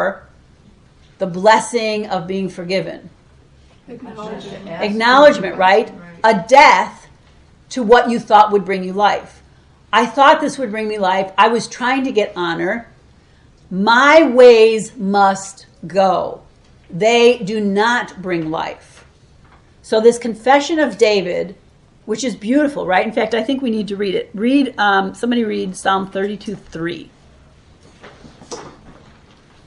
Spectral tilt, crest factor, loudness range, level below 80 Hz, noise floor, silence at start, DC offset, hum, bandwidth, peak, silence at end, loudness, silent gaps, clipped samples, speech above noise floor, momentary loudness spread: -4.5 dB/octave; 16 dB; 7 LU; -52 dBFS; -48 dBFS; 0 s; under 0.1%; none; 11.5 kHz; 0 dBFS; 0.75 s; -15 LUFS; none; under 0.1%; 34 dB; 19 LU